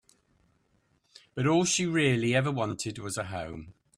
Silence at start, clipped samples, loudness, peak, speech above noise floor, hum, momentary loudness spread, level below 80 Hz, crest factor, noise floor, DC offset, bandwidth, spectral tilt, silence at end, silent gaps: 1.35 s; under 0.1%; -28 LUFS; -12 dBFS; 42 dB; none; 15 LU; -62 dBFS; 18 dB; -70 dBFS; under 0.1%; 13.5 kHz; -4.5 dB/octave; 0.25 s; none